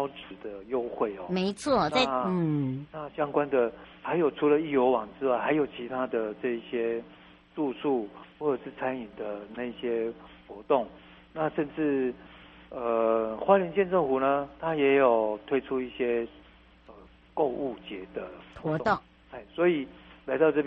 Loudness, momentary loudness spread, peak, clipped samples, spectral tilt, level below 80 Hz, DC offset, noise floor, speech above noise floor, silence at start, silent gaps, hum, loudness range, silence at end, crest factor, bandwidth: -29 LUFS; 16 LU; -8 dBFS; under 0.1%; -4.5 dB/octave; -60 dBFS; under 0.1%; -55 dBFS; 27 dB; 0 s; none; none; 7 LU; 0 s; 22 dB; 8 kHz